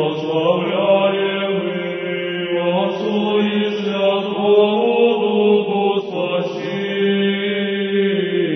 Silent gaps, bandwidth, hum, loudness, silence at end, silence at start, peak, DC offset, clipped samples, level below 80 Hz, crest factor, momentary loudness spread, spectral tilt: none; 6.2 kHz; none; -18 LUFS; 0 s; 0 s; -2 dBFS; under 0.1%; under 0.1%; -66 dBFS; 14 dB; 7 LU; -7.5 dB/octave